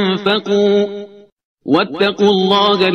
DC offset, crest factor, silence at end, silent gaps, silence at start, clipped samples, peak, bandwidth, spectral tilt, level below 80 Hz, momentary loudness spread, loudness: under 0.1%; 14 dB; 0 s; 1.32-1.37 s, 1.45-1.57 s; 0 s; under 0.1%; 0 dBFS; 6.6 kHz; -6 dB/octave; -56 dBFS; 9 LU; -14 LUFS